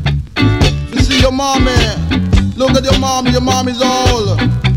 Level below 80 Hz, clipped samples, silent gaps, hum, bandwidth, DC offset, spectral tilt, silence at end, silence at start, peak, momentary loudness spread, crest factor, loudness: -20 dBFS; under 0.1%; none; none; 16.5 kHz; under 0.1%; -5 dB/octave; 0 s; 0 s; 0 dBFS; 3 LU; 12 dB; -12 LUFS